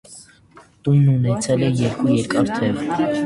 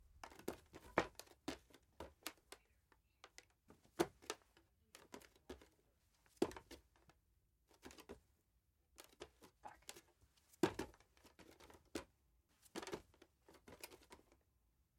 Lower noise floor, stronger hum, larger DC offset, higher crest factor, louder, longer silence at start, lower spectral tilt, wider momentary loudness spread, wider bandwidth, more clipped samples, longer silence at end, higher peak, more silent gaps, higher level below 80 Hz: second, -49 dBFS vs -81 dBFS; neither; neither; second, 14 dB vs 32 dB; first, -19 LUFS vs -50 LUFS; about the same, 0.1 s vs 0 s; first, -7 dB/octave vs -4 dB/octave; second, 5 LU vs 22 LU; second, 11.5 kHz vs 16.5 kHz; neither; second, 0 s vs 0.8 s; first, -4 dBFS vs -20 dBFS; neither; first, -50 dBFS vs -74 dBFS